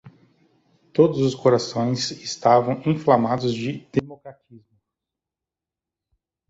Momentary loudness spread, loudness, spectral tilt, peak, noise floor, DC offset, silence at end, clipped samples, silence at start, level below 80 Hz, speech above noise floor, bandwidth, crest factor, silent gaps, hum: 9 LU; -21 LUFS; -6 dB/octave; -2 dBFS; -88 dBFS; under 0.1%; 1.9 s; under 0.1%; 0.05 s; -60 dBFS; 67 dB; 8 kHz; 20 dB; none; none